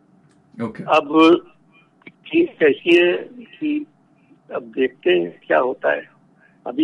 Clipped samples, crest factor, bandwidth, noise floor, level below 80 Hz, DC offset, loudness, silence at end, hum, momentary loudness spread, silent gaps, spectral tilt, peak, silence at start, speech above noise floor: under 0.1%; 16 dB; 7 kHz; -55 dBFS; -68 dBFS; under 0.1%; -18 LUFS; 0 s; none; 17 LU; none; -6 dB/octave; -4 dBFS; 0.6 s; 37 dB